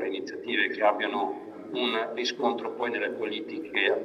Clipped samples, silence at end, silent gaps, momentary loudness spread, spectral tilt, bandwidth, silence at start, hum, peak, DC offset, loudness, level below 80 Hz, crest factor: under 0.1%; 0 s; none; 9 LU; -3.5 dB/octave; 8.4 kHz; 0 s; none; -10 dBFS; under 0.1%; -29 LUFS; -80 dBFS; 20 dB